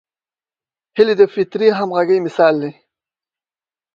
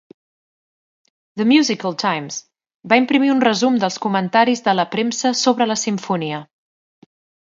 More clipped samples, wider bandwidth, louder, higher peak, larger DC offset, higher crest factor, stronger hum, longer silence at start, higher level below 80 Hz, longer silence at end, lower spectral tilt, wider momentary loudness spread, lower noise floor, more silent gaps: neither; about the same, 7.2 kHz vs 7.8 kHz; about the same, -15 LUFS vs -17 LUFS; about the same, 0 dBFS vs 0 dBFS; neither; about the same, 18 dB vs 18 dB; neither; second, 0.95 s vs 1.35 s; first, -64 dBFS vs -70 dBFS; first, 1.25 s vs 0.95 s; first, -7 dB/octave vs -4 dB/octave; about the same, 10 LU vs 10 LU; about the same, under -90 dBFS vs under -90 dBFS; second, none vs 2.76-2.80 s